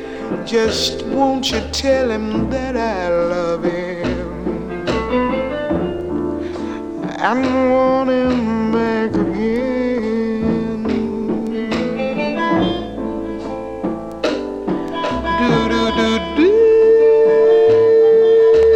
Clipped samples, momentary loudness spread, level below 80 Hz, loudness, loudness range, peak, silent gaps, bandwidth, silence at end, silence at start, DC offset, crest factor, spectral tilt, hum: under 0.1%; 13 LU; -38 dBFS; -17 LUFS; 8 LU; -2 dBFS; none; 9.4 kHz; 0 s; 0 s; under 0.1%; 14 dB; -5.5 dB/octave; none